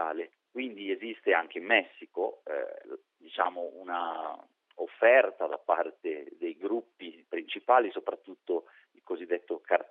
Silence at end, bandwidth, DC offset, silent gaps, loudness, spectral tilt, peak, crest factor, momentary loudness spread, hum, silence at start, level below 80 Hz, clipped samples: 0.05 s; 4 kHz; under 0.1%; none; -31 LUFS; 0.5 dB/octave; -8 dBFS; 22 dB; 16 LU; none; 0 s; under -90 dBFS; under 0.1%